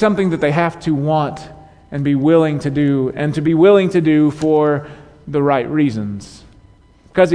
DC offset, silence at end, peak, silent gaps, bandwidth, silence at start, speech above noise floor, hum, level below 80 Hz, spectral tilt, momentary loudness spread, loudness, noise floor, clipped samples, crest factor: under 0.1%; 0 s; -2 dBFS; none; 10 kHz; 0 s; 32 dB; none; -48 dBFS; -8 dB/octave; 11 LU; -16 LUFS; -47 dBFS; under 0.1%; 14 dB